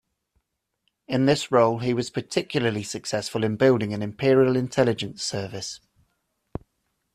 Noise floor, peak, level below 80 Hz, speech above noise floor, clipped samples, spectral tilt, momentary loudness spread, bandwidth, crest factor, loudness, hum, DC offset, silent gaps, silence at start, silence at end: -75 dBFS; -6 dBFS; -58 dBFS; 52 dB; under 0.1%; -5.5 dB/octave; 15 LU; 13.5 kHz; 20 dB; -24 LUFS; none; under 0.1%; none; 1.1 s; 1.4 s